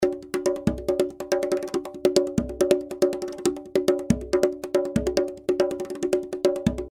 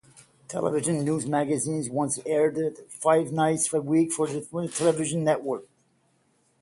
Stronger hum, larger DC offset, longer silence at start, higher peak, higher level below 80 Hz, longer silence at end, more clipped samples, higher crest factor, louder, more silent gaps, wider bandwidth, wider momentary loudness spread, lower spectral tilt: neither; neither; second, 0 s vs 0.5 s; first, -4 dBFS vs -8 dBFS; first, -44 dBFS vs -68 dBFS; second, 0 s vs 0.95 s; neither; about the same, 22 dB vs 18 dB; about the same, -25 LUFS vs -26 LUFS; neither; first, 16 kHz vs 11.5 kHz; second, 5 LU vs 8 LU; about the same, -5.5 dB/octave vs -5 dB/octave